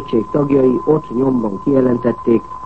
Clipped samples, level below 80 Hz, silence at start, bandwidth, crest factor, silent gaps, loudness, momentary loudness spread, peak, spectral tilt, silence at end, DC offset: under 0.1%; -44 dBFS; 0 s; 5.8 kHz; 14 dB; none; -15 LUFS; 4 LU; -2 dBFS; -10 dB/octave; 0 s; 1%